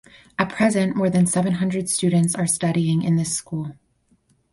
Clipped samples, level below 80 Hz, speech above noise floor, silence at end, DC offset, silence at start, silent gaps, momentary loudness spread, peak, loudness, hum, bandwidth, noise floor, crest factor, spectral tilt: under 0.1%; -56 dBFS; 43 dB; 0.8 s; under 0.1%; 0.4 s; none; 9 LU; -4 dBFS; -21 LUFS; none; 11.5 kHz; -63 dBFS; 16 dB; -5.5 dB/octave